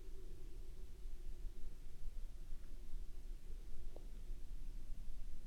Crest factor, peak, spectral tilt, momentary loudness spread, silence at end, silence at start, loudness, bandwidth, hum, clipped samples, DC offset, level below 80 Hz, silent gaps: 10 dB; -32 dBFS; -6 dB/octave; 2 LU; 0 s; 0 s; -57 LUFS; 6.4 kHz; none; under 0.1%; under 0.1%; -46 dBFS; none